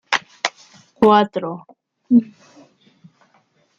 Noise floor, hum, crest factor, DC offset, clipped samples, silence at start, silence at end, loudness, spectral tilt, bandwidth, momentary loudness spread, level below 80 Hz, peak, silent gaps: -60 dBFS; none; 20 dB; under 0.1%; under 0.1%; 0.1 s; 1.55 s; -18 LUFS; -5 dB/octave; 7.6 kHz; 17 LU; -60 dBFS; -2 dBFS; none